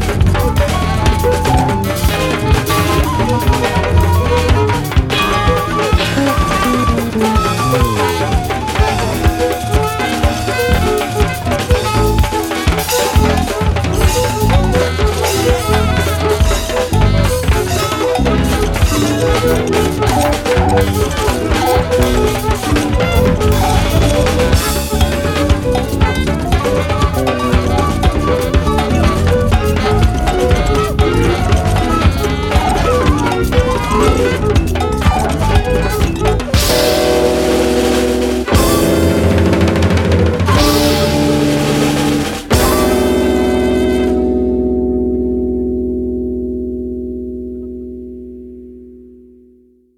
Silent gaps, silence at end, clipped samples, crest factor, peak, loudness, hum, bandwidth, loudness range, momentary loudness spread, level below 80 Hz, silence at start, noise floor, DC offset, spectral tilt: none; 0.9 s; under 0.1%; 12 dB; 0 dBFS; -14 LUFS; none; 18 kHz; 2 LU; 4 LU; -20 dBFS; 0 s; -48 dBFS; under 0.1%; -5.5 dB/octave